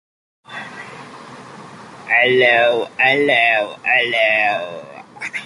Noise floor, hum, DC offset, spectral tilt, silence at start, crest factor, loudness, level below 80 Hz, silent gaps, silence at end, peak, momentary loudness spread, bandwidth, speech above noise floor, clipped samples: -37 dBFS; none; under 0.1%; -4 dB/octave; 0.5 s; 16 dB; -14 LUFS; -68 dBFS; none; 0 s; -2 dBFS; 24 LU; 11.5 kHz; 22 dB; under 0.1%